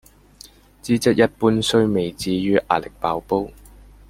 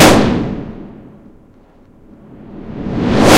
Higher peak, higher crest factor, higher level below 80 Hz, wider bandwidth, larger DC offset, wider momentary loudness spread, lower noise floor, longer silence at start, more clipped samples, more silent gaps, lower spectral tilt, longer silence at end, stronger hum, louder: about the same, -2 dBFS vs 0 dBFS; about the same, 18 dB vs 14 dB; second, -48 dBFS vs -32 dBFS; second, 16.5 kHz vs over 20 kHz; neither; second, 8 LU vs 24 LU; about the same, -47 dBFS vs -44 dBFS; first, 0.45 s vs 0 s; second, under 0.1% vs 0.5%; neither; about the same, -5.5 dB/octave vs -4.5 dB/octave; first, 0.6 s vs 0 s; first, 50 Hz at -45 dBFS vs none; second, -20 LUFS vs -15 LUFS